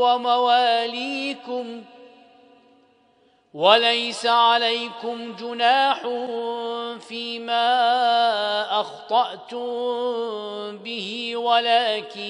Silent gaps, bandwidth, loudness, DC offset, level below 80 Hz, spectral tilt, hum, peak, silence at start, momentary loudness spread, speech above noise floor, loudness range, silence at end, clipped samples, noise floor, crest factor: none; 10.5 kHz; -22 LUFS; under 0.1%; -84 dBFS; -2.5 dB/octave; none; -2 dBFS; 0 s; 14 LU; 39 dB; 5 LU; 0 s; under 0.1%; -60 dBFS; 22 dB